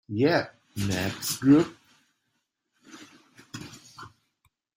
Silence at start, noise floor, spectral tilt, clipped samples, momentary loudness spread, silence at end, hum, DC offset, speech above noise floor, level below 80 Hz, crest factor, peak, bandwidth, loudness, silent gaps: 0.1 s; -78 dBFS; -5 dB/octave; under 0.1%; 25 LU; 0.7 s; none; under 0.1%; 54 dB; -62 dBFS; 20 dB; -8 dBFS; 16.5 kHz; -25 LUFS; none